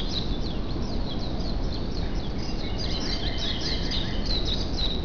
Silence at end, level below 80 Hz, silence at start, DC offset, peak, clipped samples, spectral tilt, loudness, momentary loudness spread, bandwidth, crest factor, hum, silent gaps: 0 s; -30 dBFS; 0 s; 2%; -14 dBFS; under 0.1%; -5 dB/octave; -29 LUFS; 5 LU; 5.4 kHz; 12 dB; none; none